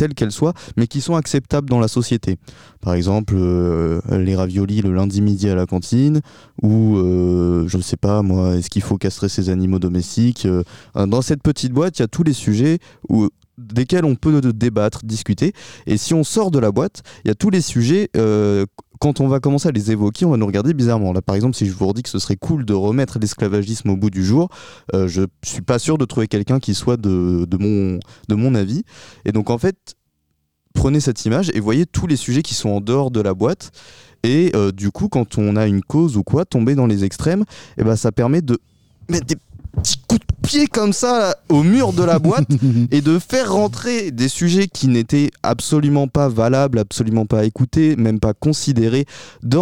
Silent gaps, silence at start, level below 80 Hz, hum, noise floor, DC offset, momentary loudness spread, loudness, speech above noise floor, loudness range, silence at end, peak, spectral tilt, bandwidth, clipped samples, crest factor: none; 0 s; -40 dBFS; none; -69 dBFS; 0.4%; 6 LU; -18 LUFS; 52 dB; 3 LU; 0 s; -2 dBFS; -6.5 dB/octave; 16 kHz; under 0.1%; 14 dB